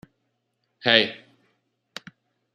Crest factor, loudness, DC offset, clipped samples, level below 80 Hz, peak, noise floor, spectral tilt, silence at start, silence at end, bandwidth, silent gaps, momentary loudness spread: 28 dB; -20 LUFS; under 0.1%; under 0.1%; -72 dBFS; -2 dBFS; -75 dBFS; -4 dB/octave; 0.85 s; 1.4 s; 13 kHz; none; 23 LU